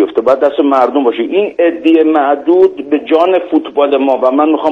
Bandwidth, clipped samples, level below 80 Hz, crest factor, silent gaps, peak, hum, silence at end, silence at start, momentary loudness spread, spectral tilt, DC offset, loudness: 6 kHz; 0.2%; -58 dBFS; 10 dB; none; 0 dBFS; none; 0 s; 0 s; 4 LU; -6.5 dB/octave; under 0.1%; -11 LUFS